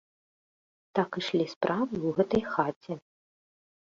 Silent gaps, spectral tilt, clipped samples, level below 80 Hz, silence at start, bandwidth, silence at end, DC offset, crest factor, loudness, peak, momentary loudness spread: 1.56-1.61 s, 2.76-2.81 s; -6.5 dB/octave; under 0.1%; -64 dBFS; 0.95 s; 7.6 kHz; 1 s; under 0.1%; 24 dB; -30 LUFS; -8 dBFS; 11 LU